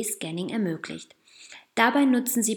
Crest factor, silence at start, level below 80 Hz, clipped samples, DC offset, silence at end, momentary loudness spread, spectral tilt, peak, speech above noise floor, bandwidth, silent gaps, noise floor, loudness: 22 dB; 0 s; -78 dBFS; under 0.1%; under 0.1%; 0 s; 21 LU; -3.5 dB/octave; -4 dBFS; 24 dB; over 20 kHz; none; -49 dBFS; -25 LUFS